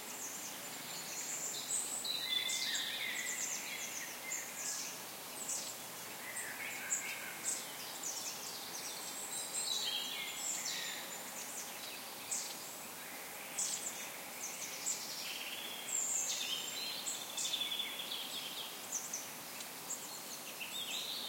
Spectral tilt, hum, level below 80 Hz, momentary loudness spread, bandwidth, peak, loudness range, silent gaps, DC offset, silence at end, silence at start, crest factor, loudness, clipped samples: 1 dB/octave; none; -84 dBFS; 9 LU; 16.5 kHz; -22 dBFS; 4 LU; none; under 0.1%; 0 s; 0 s; 20 dB; -39 LUFS; under 0.1%